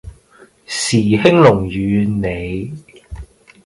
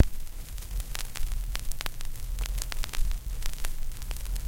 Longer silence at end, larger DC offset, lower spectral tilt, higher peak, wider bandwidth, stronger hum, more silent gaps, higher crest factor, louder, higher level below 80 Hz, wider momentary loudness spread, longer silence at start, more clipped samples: first, 0.4 s vs 0 s; neither; first, -5.5 dB/octave vs -2.5 dB/octave; about the same, 0 dBFS vs -2 dBFS; second, 11.5 kHz vs 17 kHz; neither; neither; second, 16 dB vs 26 dB; first, -15 LUFS vs -36 LUFS; second, -38 dBFS vs -32 dBFS; first, 25 LU vs 6 LU; about the same, 0.05 s vs 0 s; neither